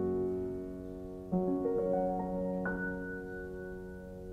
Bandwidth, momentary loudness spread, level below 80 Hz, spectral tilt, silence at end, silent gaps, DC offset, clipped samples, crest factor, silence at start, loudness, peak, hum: 7.6 kHz; 12 LU; -54 dBFS; -9.5 dB/octave; 0 s; none; under 0.1%; under 0.1%; 16 dB; 0 s; -36 LUFS; -20 dBFS; none